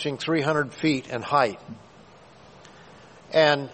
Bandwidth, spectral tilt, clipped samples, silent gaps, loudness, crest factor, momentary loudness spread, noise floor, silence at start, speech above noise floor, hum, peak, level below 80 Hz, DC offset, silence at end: 8.8 kHz; -5.5 dB/octave; under 0.1%; none; -24 LUFS; 22 dB; 20 LU; -50 dBFS; 0 s; 27 dB; none; -4 dBFS; -62 dBFS; under 0.1%; 0 s